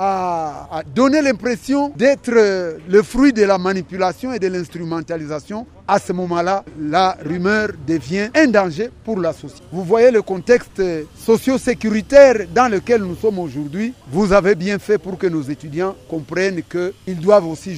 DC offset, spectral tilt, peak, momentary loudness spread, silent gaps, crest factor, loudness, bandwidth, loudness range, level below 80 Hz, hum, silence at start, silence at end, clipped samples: under 0.1%; -6 dB/octave; 0 dBFS; 12 LU; none; 16 dB; -17 LUFS; 15.5 kHz; 5 LU; -44 dBFS; none; 0 s; 0 s; under 0.1%